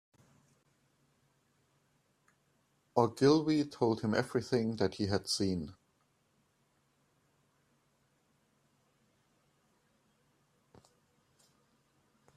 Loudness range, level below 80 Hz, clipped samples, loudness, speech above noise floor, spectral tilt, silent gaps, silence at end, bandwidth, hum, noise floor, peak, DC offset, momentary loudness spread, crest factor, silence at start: 9 LU; -72 dBFS; under 0.1%; -32 LUFS; 44 dB; -5.5 dB/octave; none; 6.65 s; 14 kHz; none; -75 dBFS; -12 dBFS; under 0.1%; 8 LU; 26 dB; 2.95 s